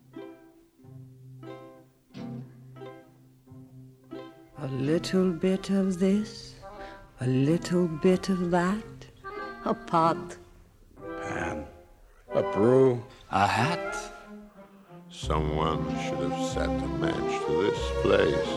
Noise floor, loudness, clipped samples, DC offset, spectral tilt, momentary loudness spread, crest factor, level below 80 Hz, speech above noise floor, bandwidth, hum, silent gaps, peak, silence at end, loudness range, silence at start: -56 dBFS; -27 LUFS; under 0.1%; under 0.1%; -6.5 dB/octave; 22 LU; 20 dB; -46 dBFS; 30 dB; 12.5 kHz; none; none; -8 dBFS; 0 s; 18 LU; 0.15 s